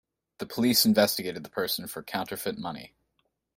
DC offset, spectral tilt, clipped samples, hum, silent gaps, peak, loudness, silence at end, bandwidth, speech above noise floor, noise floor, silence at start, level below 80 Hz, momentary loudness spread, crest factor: under 0.1%; -3.5 dB/octave; under 0.1%; none; none; -8 dBFS; -27 LUFS; 0.7 s; 16.5 kHz; 48 dB; -76 dBFS; 0.4 s; -66 dBFS; 16 LU; 20 dB